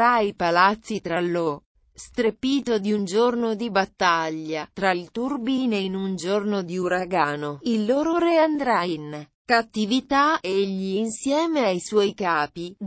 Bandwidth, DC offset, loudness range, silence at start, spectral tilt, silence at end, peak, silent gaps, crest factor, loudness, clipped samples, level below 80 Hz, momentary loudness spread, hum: 8 kHz; under 0.1%; 2 LU; 0 s; -5 dB/octave; 0 s; -6 dBFS; 1.66-1.75 s, 9.35-9.45 s; 18 dB; -23 LUFS; under 0.1%; -60 dBFS; 9 LU; none